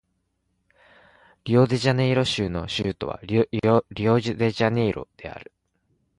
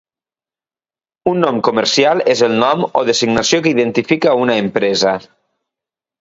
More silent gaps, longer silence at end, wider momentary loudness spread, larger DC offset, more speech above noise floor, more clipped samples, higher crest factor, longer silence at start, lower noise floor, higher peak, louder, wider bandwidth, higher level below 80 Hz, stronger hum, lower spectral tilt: neither; second, 0.75 s vs 1 s; first, 17 LU vs 3 LU; neither; second, 51 dB vs over 76 dB; neither; about the same, 18 dB vs 16 dB; first, 1.45 s vs 1.25 s; second, -73 dBFS vs under -90 dBFS; second, -6 dBFS vs 0 dBFS; second, -23 LUFS vs -14 LUFS; first, 11.5 kHz vs 7.8 kHz; first, -50 dBFS vs -56 dBFS; neither; first, -6.5 dB/octave vs -4 dB/octave